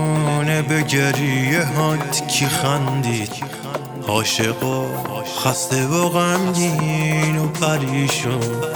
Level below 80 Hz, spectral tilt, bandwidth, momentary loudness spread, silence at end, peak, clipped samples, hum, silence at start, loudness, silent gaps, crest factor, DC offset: -52 dBFS; -4.5 dB/octave; over 20 kHz; 7 LU; 0 s; -2 dBFS; under 0.1%; none; 0 s; -19 LUFS; none; 18 dB; under 0.1%